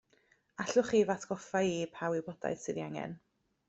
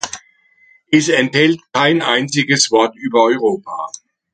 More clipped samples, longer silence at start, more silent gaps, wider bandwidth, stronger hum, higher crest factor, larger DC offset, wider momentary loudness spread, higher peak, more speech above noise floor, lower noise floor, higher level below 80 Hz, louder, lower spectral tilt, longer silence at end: neither; first, 0.6 s vs 0.05 s; neither; second, 8.2 kHz vs 9.4 kHz; neither; about the same, 20 dB vs 16 dB; neither; about the same, 13 LU vs 14 LU; second, -16 dBFS vs 0 dBFS; about the same, 37 dB vs 38 dB; first, -71 dBFS vs -53 dBFS; second, -72 dBFS vs -62 dBFS; second, -34 LUFS vs -14 LUFS; first, -5 dB/octave vs -3.5 dB/octave; about the same, 0.5 s vs 0.45 s